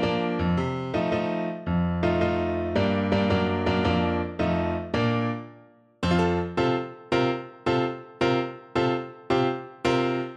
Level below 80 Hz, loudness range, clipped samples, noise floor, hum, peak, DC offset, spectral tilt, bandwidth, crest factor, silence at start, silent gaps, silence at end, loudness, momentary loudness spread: -46 dBFS; 2 LU; under 0.1%; -53 dBFS; none; -10 dBFS; under 0.1%; -7 dB/octave; 9.2 kHz; 16 dB; 0 s; none; 0 s; -26 LUFS; 5 LU